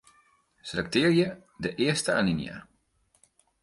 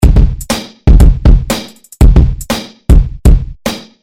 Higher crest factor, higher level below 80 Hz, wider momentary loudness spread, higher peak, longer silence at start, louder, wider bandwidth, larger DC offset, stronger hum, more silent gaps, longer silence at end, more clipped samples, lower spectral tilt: first, 20 dB vs 8 dB; second, -58 dBFS vs -8 dBFS; first, 16 LU vs 11 LU; second, -10 dBFS vs 0 dBFS; first, 0.65 s vs 0 s; second, -27 LUFS vs -11 LUFS; second, 11.5 kHz vs 16 kHz; neither; neither; neither; first, 1 s vs 0.25 s; second, under 0.1% vs 5%; second, -5 dB/octave vs -6.5 dB/octave